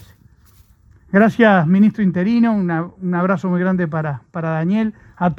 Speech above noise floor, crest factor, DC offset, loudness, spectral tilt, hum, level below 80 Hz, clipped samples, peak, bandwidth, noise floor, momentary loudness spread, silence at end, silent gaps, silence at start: 34 dB; 18 dB; under 0.1%; -17 LUFS; -9 dB/octave; none; -52 dBFS; under 0.1%; 0 dBFS; 6.6 kHz; -50 dBFS; 11 LU; 0 s; none; 1.1 s